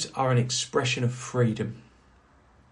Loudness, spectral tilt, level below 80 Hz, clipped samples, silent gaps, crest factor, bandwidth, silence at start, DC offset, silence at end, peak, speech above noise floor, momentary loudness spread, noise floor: -27 LUFS; -4.5 dB/octave; -60 dBFS; under 0.1%; none; 16 dB; 11 kHz; 0 s; under 0.1%; 0.9 s; -12 dBFS; 32 dB; 9 LU; -58 dBFS